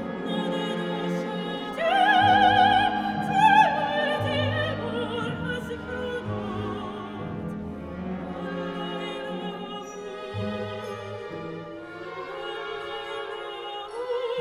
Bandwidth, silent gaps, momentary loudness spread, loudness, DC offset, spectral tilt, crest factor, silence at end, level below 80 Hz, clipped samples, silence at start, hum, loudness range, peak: 14 kHz; none; 17 LU; -26 LUFS; under 0.1%; -5.5 dB/octave; 20 dB; 0 s; -54 dBFS; under 0.1%; 0 s; none; 14 LU; -6 dBFS